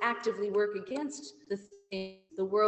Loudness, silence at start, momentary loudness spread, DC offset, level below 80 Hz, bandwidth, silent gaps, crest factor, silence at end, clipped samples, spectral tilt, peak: -35 LUFS; 0 s; 11 LU; under 0.1%; -78 dBFS; 8.6 kHz; none; 16 dB; 0 s; under 0.1%; -4.5 dB/octave; -16 dBFS